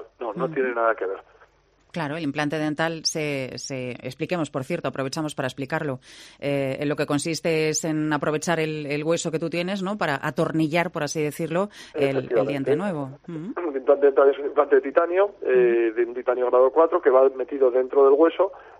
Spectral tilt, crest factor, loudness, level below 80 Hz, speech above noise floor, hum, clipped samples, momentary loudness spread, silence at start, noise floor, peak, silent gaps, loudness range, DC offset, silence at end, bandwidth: -5 dB/octave; 18 dB; -23 LUFS; -64 dBFS; 38 dB; none; under 0.1%; 12 LU; 0 s; -60 dBFS; -6 dBFS; none; 8 LU; under 0.1%; 0.05 s; 14.5 kHz